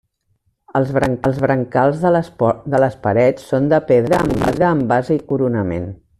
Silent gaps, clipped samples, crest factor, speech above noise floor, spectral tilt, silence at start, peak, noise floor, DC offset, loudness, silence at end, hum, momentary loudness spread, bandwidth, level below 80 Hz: none; under 0.1%; 14 dB; 49 dB; -8 dB/octave; 0.75 s; -2 dBFS; -65 dBFS; under 0.1%; -17 LUFS; 0.25 s; none; 5 LU; 13.5 kHz; -44 dBFS